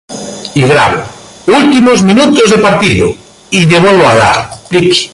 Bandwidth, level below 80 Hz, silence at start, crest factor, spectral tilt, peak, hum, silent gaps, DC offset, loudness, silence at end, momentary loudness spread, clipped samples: 11.5 kHz; -36 dBFS; 0.1 s; 8 dB; -5 dB/octave; 0 dBFS; none; none; under 0.1%; -7 LUFS; 0.05 s; 12 LU; under 0.1%